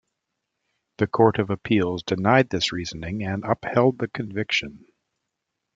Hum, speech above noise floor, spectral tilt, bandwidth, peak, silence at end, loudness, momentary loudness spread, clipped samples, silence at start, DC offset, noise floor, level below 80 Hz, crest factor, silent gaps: none; 58 dB; -6 dB/octave; 7.8 kHz; -2 dBFS; 1 s; -23 LUFS; 10 LU; under 0.1%; 1 s; under 0.1%; -81 dBFS; -56 dBFS; 22 dB; none